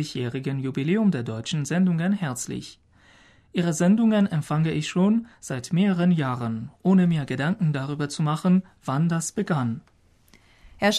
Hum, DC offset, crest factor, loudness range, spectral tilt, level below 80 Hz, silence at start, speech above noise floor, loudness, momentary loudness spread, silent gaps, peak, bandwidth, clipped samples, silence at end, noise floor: none; under 0.1%; 14 dB; 3 LU; -6 dB/octave; -60 dBFS; 0 s; 34 dB; -24 LUFS; 10 LU; none; -10 dBFS; 13 kHz; under 0.1%; 0 s; -57 dBFS